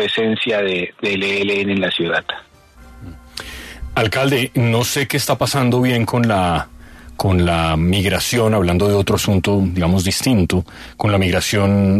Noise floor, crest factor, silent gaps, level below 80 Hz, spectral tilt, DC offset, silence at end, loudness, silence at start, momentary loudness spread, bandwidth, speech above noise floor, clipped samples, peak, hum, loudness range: -42 dBFS; 14 dB; none; -36 dBFS; -5 dB/octave; under 0.1%; 0 s; -17 LUFS; 0 s; 8 LU; 14 kHz; 26 dB; under 0.1%; -2 dBFS; none; 4 LU